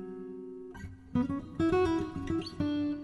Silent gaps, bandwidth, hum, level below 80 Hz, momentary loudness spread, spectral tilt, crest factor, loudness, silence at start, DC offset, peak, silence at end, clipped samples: none; 11 kHz; none; -52 dBFS; 17 LU; -7.5 dB/octave; 16 dB; -32 LUFS; 0 s; under 0.1%; -18 dBFS; 0 s; under 0.1%